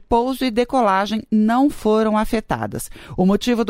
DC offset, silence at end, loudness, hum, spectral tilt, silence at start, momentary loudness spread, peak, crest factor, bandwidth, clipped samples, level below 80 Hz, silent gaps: under 0.1%; 0 s; -19 LUFS; none; -6 dB/octave; 0 s; 8 LU; -6 dBFS; 14 dB; 16 kHz; under 0.1%; -40 dBFS; none